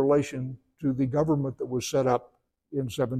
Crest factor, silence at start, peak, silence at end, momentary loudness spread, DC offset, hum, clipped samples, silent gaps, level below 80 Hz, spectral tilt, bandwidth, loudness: 18 dB; 0 s; -10 dBFS; 0 s; 10 LU; under 0.1%; none; under 0.1%; none; -58 dBFS; -6.5 dB/octave; 15.5 kHz; -28 LUFS